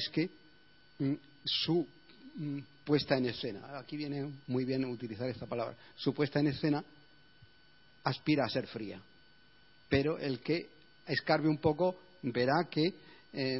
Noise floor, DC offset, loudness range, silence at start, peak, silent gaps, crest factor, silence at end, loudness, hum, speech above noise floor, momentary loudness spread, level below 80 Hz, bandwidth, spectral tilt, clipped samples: -64 dBFS; under 0.1%; 4 LU; 0 s; -14 dBFS; none; 22 dB; 0 s; -34 LUFS; none; 31 dB; 13 LU; -64 dBFS; 5.8 kHz; -9.5 dB/octave; under 0.1%